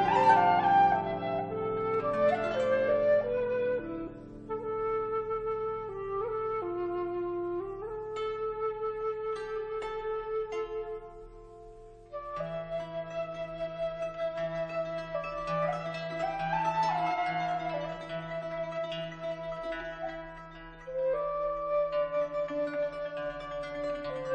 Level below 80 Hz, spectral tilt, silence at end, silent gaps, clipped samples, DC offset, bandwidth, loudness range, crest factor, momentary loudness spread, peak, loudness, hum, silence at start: -56 dBFS; -6.5 dB/octave; 0 s; none; under 0.1%; under 0.1%; 9.2 kHz; 8 LU; 20 dB; 12 LU; -10 dBFS; -32 LUFS; none; 0 s